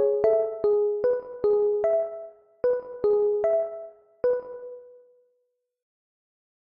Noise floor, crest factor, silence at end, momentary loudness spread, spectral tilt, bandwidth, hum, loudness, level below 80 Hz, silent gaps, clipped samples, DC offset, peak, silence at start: -75 dBFS; 16 dB; 1.7 s; 18 LU; -8.5 dB/octave; 4.4 kHz; none; -25 LUFS; -64 dBFS; none; under 0.1%; under 0.1%; -10 dBFS; 0 s